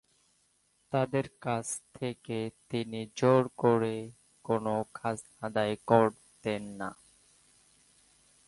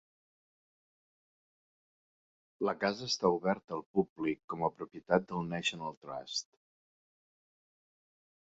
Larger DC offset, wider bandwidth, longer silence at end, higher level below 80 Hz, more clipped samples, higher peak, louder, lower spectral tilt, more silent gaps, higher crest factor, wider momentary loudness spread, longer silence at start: neither; first, 11.5 kHz vs 7.6 kHz; second, 1.55 s vs 2.05 s; about the same, -68 dBFS vs -72 dBFS; neither; first, -10 dBFS vs -14 dBFS; first, -31 LUFS vs -35 LUFS; first, -6 dB/octave vs -3.5 dB/octave; second, none vs 3.64-3.68 s, 3.86-3.94 s, 4.09-4.16 s, 4.44-4.48 s, 5.97-6.02 s; about the same, 22 dB vs 24 dB; about the same, 13 LU vs 11 LU; second, 0.9 s vs 2.6 s